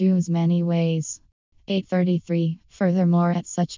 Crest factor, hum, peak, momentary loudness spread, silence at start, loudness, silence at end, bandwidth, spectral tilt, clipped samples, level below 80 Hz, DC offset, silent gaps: 12 dB; none; -10 dBFS; 8 LU; 0 s; -23 LUFS; 0 s; 7.6 kHz; -7 dB/octave; under 0.1%; -64 dBFS; under 0.1%; 1.32-1.52 s